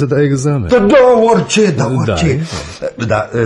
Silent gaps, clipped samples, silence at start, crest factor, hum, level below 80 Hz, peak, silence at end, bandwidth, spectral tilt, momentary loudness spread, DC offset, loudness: none; under 0.1%; 0 s; 12 dB; none; -36 dBFS; 0 dBFS; 0 s; 11.5 kHz; -6 dB/octave; 13 LU; under 0.1%; -12 LUFS